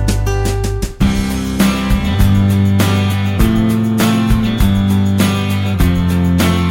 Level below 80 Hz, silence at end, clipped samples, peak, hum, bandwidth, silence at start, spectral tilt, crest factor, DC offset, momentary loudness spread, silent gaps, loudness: -20 dBFS; 0 s; under 0.1%; 0 dBFS; none; 17 kHz; 0 s; -6 dB/octave; 12 dB; under 0.1%; 4 LU; none; -14 LUFS